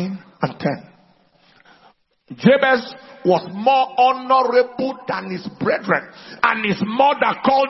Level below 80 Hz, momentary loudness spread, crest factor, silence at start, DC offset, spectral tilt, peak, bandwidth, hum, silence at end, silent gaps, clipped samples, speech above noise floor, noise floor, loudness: -62 dBFS; 11 LU; 18 dB; 0 s; under 0.1%; -7 dB/octave; 0 dBFS; 6 kHz; none; 0 s; none; under 0.1%; 37 dB; -55 dBFS; -18 LUFS